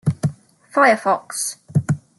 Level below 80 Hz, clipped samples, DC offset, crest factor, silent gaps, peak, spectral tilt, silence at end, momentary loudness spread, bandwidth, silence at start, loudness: -60 dBFS; under 0.1%; under 0.1%; 18 dB; none; -2 dBFS; -5 dB/octave; 0.2 s; 10 LU; 12.5 kHz; 0.05 s; -19 LUFS